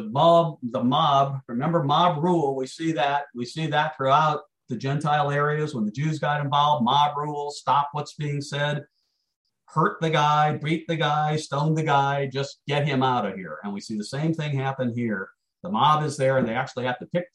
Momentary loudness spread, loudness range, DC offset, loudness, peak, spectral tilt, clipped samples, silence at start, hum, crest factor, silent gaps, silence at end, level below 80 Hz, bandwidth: 10 LU; 3 LU; under 0.1%; -24 LUFS; -6 dBFS; -6 dB/octave; under 0.1%; 0 s; none; 18 dB; 9.36-9.45 s; 0.1 s; -66 dBFS; 11 kHz